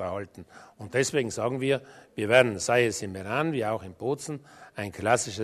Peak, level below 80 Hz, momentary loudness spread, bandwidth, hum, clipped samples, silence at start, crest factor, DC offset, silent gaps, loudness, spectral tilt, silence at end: -4 dBFS; -64 dBFS; 17 LU; 13.5 kHz; none; under 0.1%; 0 s; 24 dB; under 0.1%; none; -27 LUFS; -4 dB/octave; 0 s